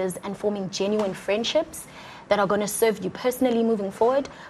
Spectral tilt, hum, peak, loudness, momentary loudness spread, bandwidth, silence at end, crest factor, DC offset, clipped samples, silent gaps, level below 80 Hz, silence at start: -4 dB/octave; none; -6 dBFS; -24 LUFS; 8 LU; 14.5 kHz; 0 s; 20 dB; under 0.1%; under 0.1%; none; -58 dBFS; 0 s